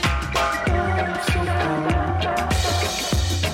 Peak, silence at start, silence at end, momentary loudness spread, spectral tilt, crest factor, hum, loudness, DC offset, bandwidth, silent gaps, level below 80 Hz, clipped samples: -8 dBFS; 0 s; 0 s; 1 LU; -4.5 dB/octave; 14 dB; none; -22 LUFS; under 0.1%; 16.5 kHz; none; -30 dBFS; under 0.1%